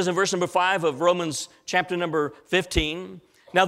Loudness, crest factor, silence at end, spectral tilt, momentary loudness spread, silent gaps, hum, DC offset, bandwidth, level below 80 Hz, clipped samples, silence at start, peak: -24 LUFS; 20 dB; 0 s; -3.5 dB/octave; 7 LU; none; none; under 0.1%; 15.5 kHz; -42 dBFS; under 0.1%; 0 s; -4 dBFS